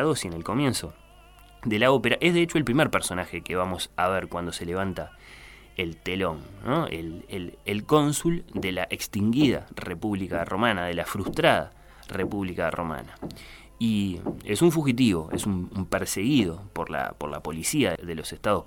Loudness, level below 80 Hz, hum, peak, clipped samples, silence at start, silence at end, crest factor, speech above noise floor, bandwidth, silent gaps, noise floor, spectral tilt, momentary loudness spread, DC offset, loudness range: -26 LUFS; -48 dBFS; none; -4 dBFS; under 0.1%; 0 s; 0 s; 22 dB; 25 dB; 17.5 kHz; none; -51 dBFS; -5 dB/octave; 14 LU; under 0.1%; 5 LU